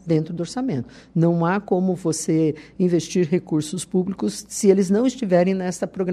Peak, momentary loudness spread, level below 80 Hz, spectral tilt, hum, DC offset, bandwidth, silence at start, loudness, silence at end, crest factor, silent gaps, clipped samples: -4 dBFS; 8 LU; -58 dBFS; -6.5 dB/octave; none; under 0.1%; 13 kHz; 0.05 s; -22 LUFS; 0 s; 18 dB; none; under 0.1%